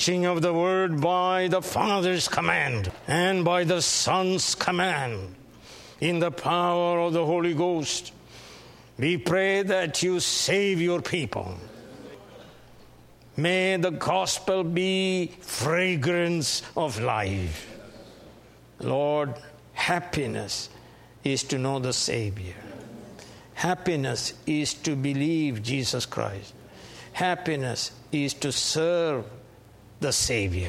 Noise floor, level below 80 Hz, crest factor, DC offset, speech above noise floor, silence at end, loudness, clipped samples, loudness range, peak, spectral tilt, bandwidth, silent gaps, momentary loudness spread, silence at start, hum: -52 dBFS; -54 dBFS; 22 dB; under 0.1%; 26 dB; 0 s; -25 LUFS; under 0.1%; 6 LU; -6 dBFS; -4 dB/octave; 16 kHz; none; 19 LU; 0 s; none